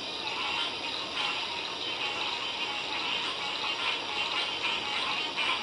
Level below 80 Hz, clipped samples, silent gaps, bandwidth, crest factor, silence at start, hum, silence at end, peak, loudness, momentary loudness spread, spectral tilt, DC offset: -68 dBFS; under 0.1%; none; 11.5 kHz; 18 dB; 0 s; none; 0 s; -16 dBFS; -30 LUFS; 3 LU; -1 dB/octave; under 0.1%